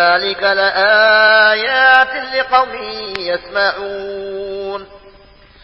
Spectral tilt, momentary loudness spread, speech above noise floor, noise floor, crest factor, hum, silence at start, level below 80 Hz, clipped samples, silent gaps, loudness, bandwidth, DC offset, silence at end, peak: -4 dB/octave; 16 LU; 30 dB; -44 dBFS; 14 dB; none; 0 s; -50 dBFS; under 0.1%; none; -12 LUFS; 8 kHz; under 0.1%; 0.55 s; 0 dBFS